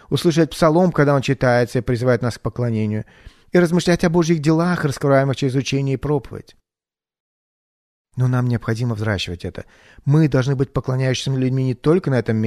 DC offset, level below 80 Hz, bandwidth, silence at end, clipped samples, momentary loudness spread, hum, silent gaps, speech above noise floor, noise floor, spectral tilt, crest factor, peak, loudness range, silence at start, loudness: under 0.1%; -44 dBFS; 13.5 kHz; 0 s; under 0.1%; 8 LU; none; 7.20-8.05 s; over 72 dB; under -90 dBFS; -6.5 dB/octave; 16 dB; -2 dBFS; 6 LU; 0.1 s; -19 LUFS